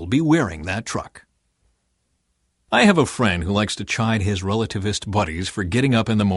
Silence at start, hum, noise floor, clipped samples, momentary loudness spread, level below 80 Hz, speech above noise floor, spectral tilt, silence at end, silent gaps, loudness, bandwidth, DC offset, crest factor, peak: 0 s; none; -70 dBFS; under 0.1%; 10 LU; -44 dBFS; 50 dB; -5.5 dB/octave; 0 s; none; -20 LUFS; 11.5 kHz; under 0.1%; 18 dB; -4 dBFS